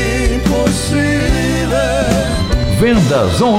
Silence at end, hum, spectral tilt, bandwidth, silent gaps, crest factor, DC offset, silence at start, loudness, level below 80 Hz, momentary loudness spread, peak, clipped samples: 0 s; none; -5.5 dB/octave; 16.5 kHz; none; 10 dB; under 0.1%; 0 s; -14 LUFS; -20 dBFS; 4 LU; -2 dBFS; under 0.1%